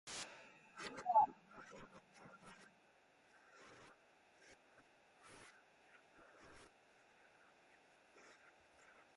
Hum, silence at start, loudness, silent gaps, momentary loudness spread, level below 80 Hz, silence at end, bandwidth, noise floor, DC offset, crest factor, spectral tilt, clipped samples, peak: none; 0.05 s; -40 LUFS; none; 28 LU; -84 dBFS; 2.55 s; 11.5 kHz; -72 dBFS; under 0.1%; 26 dB; -2.5 dB/octave; under 0.1%; -22 dBFS